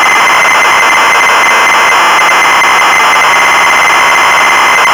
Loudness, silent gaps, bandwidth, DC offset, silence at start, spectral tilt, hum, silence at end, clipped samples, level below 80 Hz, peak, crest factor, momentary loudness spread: -4 LUFS; none; over 20 kHz; under 0.1%; 0 s; 0 dB/octave; none; 0 s; under 0.1%; -46 dBFS; -4 dBFS; 2 dB; 0 LU